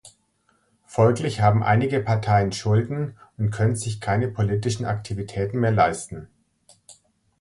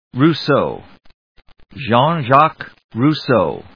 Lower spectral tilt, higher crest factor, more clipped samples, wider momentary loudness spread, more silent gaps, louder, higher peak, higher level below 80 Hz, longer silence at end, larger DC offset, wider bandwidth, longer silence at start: second, -6.5 dB/octave vs -8 dB/octave; about the same, 20 dB vs 16 dB; neither; second, 10 LU vs 16 LU; second, none vs 1.14-1.35 s, 2.84-2.89 s; second, -23 LUFS vs -15 LUFS; second, -4 dBFS vs 0 dBFS; about the same, -48 dBFS vs -52 dBFS; first, 0.5 s vs 0.15 s; second, under 0.1% vs 0.2%; first, 11.5 kHz vs 5.4 kHz; about the same, 0.05 s vs 0.15 s